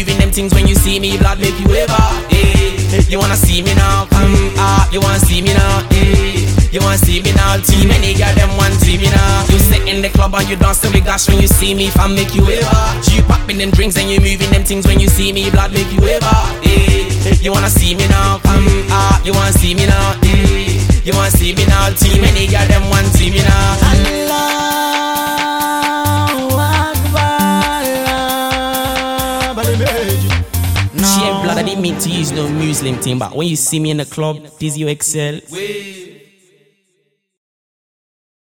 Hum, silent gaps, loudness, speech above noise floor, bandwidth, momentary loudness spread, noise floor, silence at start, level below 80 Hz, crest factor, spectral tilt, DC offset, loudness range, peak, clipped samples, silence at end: none; none; -12 LUFS; 53 dB; 17.5 kHz; 5 LU; -64 dBFS; 0 s; -16 dBFS; 12 dB; -4.5 dB/octave; 0.3%; 5 LU; 0 dBFS; under 0.1%; 2.35 s